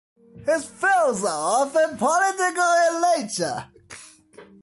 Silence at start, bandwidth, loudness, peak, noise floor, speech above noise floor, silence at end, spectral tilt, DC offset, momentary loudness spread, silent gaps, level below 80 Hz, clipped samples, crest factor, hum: 0.35 s; 11.5 kHz; -21 LUFS; -10 dBFS; -48 dBFS; 27 dB; 0.2 s; -2.5 dB/octave; under 0.1%; 16 LU; none; -64 dBFS; under 0.1%; 14 dB; none